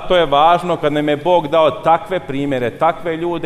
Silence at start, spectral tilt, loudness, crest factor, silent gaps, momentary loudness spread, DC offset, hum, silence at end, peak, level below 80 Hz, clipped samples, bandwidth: 0 s; -6.5 dB/octave; -15 LUFS; 14 dB; none; 8 LU; under 0.1%; none; 0 s; -2 dBFS; -40 dBFS; under 0.1%; 13 kHz